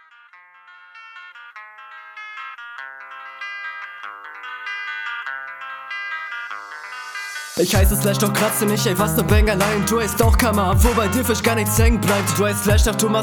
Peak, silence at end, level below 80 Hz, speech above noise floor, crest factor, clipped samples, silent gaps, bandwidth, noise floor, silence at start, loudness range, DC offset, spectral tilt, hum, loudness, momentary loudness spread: -2 dBFS; 0 s; -26 dBFS; 31 dB; 18 dB; under 0.1%; none; over 20 kHz; -48 dBFS; 0.7 s; 16 LU; under 0.1%; -4.5 dB/octave; none; -19 LUFS; 19 LU